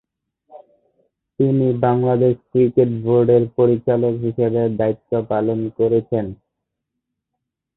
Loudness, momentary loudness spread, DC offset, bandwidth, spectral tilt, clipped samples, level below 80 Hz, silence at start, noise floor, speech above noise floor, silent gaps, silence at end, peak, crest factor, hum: -18 LUFS; 6 LU; under 0.1%; 4 kHz; -14 dB/octave; under 0.1%; -54 dBFS; 0.55 s; -80 dBFS; 63 dB; none; 1.45 s; -2 dBFS; 16 dB; none